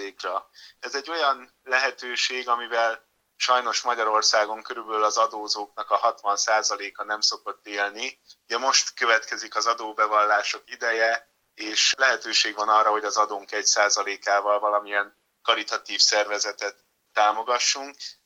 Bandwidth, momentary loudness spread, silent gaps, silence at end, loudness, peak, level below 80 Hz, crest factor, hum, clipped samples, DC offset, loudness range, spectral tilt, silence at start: 16.5 kHz; 11 LU; none; 0.15 s; -23 LUFS; -2 dBFS; -82 dBFS; 22 dB; none; under 0.1%; under 0.1%; 3 LU; 2 dB/octave; 0 s